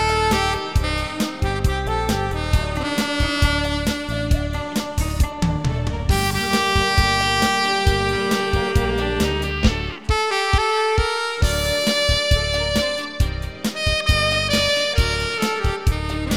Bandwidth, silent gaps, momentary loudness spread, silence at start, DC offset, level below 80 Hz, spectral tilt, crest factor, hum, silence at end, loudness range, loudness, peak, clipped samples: 19 kHz; none; 6 LU; 0 s; 0.5%; -26 dBFS; -4.5 dB/octave; 16 dB; none; 0 s; 3 LU; -20 LUFS; -4 dBFS; under 0.1%